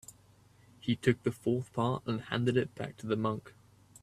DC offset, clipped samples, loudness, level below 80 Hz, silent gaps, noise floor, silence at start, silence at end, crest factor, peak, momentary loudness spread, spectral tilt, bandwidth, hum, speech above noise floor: under 0.1%; under 0.1%; -33 LUFS; -66 dBFS; none; -62 dBFS; 0.85 s; 0.55 s; 22 dB; -12 dBFS; 11 LU; -6.5 dB/octave; 14.5 kHz; none; 30 dB